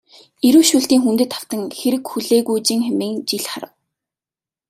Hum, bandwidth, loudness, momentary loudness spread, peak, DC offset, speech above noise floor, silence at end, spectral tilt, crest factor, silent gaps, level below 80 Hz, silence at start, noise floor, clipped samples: none; 16 kHz; -17 LUFS; 13 LU; 0 dBFS; under 0.1%; over 73 dB; 1.05 s; -3 dB/octave; 18 dB; none; -64 dBFS; 0.45 s; under -90 dBFS; under 0.1%